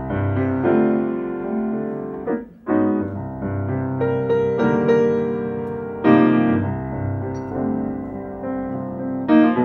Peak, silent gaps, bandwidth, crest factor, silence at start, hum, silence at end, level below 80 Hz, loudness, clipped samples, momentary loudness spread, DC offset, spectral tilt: -2 dBFS; none; 6.6 kHz; 18 dB; 0 s; none; 0 s; -48 dBFS; -21 LUFS; under 0.1%; 11 LU; under 0.1%; -9.5 dB/octave